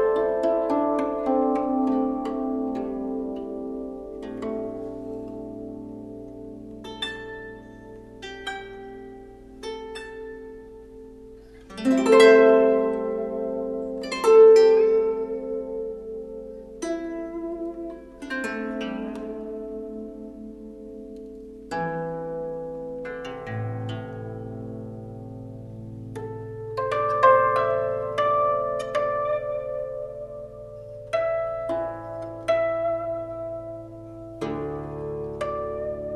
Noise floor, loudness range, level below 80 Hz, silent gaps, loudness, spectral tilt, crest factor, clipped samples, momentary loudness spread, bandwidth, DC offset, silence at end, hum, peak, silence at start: -45 dBFS; 16 LU; -52 dBFS; none; -24 LUFS; -6 dB/octave; 22 dB; under 0.1%; 21 LU; 11.5 kHz; under 0.1%; 0 s; none; -2 dBFS; 0 s